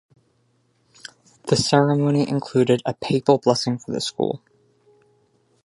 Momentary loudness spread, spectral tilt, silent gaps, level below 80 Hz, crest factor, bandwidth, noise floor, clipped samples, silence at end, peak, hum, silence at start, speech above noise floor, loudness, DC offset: 21 LU; -5.5 dB/octave; none; -58 dBFS; 22 dB; 11.5 kHz; -65 dBFS; under 0.1%; 1.25 s; 0 dBFS; none; 1.45 s; 45 dB; -20 LUFS; under 0.1%